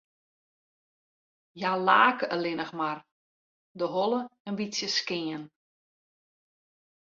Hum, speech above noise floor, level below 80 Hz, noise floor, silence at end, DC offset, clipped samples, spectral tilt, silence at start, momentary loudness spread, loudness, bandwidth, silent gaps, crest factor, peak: none; over 62 dB; -78 dBFS; under -90 dBFS; 1.55 s; under 0.1%; under 0.1%; -3.5 dB/octave; 1.55 s; 14 LU; -28 LUFS; 7.8 kHz; 3.12-3.75 s, 4.40-4.45 s; 24 dB; -8 dBFS